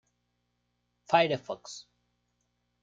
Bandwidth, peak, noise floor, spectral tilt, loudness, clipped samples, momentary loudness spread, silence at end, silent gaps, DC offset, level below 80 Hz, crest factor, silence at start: 8 kHz; -10 dBFS; -78 dBFS; -4.5 dB/octave; -28 LUFS; under 0.1%; 20 LU; 1 s; none; under 0.1%; -78 dBFS; 24 dB; 1.1 s